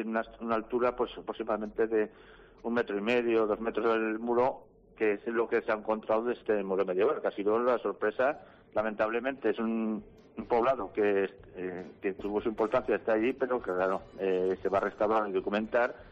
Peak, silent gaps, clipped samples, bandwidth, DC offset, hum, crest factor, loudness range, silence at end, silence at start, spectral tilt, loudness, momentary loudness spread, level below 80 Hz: -18 dBFS; none; under 0.1%; 7.4 kHz; under 0.1%; none; 14 dB; 2 LU; 0 s; 0 s; -7.5 dB/octave; -31 LUFS; 8 LU; -62 dBFS